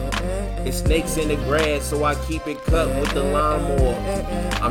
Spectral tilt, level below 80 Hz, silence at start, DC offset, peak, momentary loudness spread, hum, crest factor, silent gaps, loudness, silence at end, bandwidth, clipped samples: -5 dB/octave; -26 dBFS; 0 s; under 0.1%; -6 dBFS; 6 LU; none; 14 dB; none; -22 LUFS; 0 s; 17.5 kHz; under 0.1%